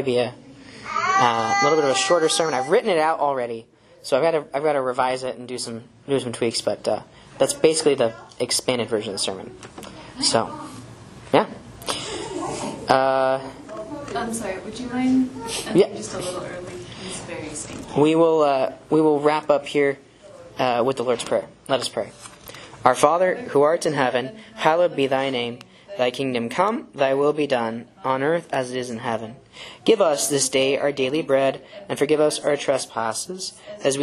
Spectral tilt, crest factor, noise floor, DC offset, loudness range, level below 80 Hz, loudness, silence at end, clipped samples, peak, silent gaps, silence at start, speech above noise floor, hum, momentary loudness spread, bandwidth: -3.5 dB/octave; 22 dB; -44 dBFS; under 0.1%; 4 LU; -58 dBFS; -22 LUFS; 0 s; under 0.1%; 0 dBFS; none; 0 s; 23 dB; none; 16 LU; 13 kHz